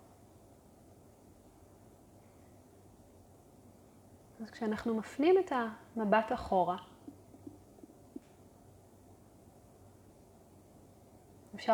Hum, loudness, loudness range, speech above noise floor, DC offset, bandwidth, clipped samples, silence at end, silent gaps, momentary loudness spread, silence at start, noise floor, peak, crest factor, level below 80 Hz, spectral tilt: none; -33 LUFS; 24 LU; 28 dB; under 0.1%; 18.5 kHz; under 0.1%; 0 s; none; 26 LU; 4.4 s; -60 dBFS; -14 dBFS; 24 dB; -66 dBFS; -6.5 dB/octave